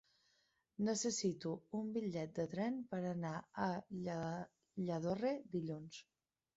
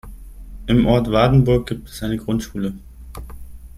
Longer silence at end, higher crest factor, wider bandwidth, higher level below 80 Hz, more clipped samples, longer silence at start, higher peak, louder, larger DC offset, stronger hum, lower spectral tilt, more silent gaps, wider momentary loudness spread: first, 0.55 s vs 0 s; about the same, 16 dB vs 18 dB; second, 8 kHz vs 15 kHz; second, -78 dBFS vs -34 dBFS; neither; first, 0.8 s vs 0.05 s; second, -26 dBFS vs -2 dBFS; second, -42 LUFS vs -19 LUFS; neither; neither; second, -6 dB/octave vs -7.5 dB/octave; neither; second, 9 LU vs 23 LU